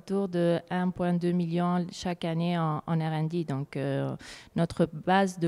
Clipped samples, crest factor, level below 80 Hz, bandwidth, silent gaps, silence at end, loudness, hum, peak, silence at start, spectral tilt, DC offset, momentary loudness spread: under 0.1%; 16 dB; -60 dBFS; 11.5 kHz; none; 0 s; -29 LUFS; none; -12 dBFS; 0.05 s; -7 dB/octave; under 0.1%; 7 LU